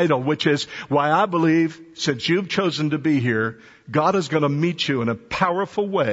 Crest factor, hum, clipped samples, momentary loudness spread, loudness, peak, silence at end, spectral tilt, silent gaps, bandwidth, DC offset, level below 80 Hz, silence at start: 16 dB; none; under 0.1%; 6 LU; -21 LUFS; -4 dBFS; 0 s; -6 dB/octave; none; 8 kHz; under 0.1%; -58 dBFS; 0 s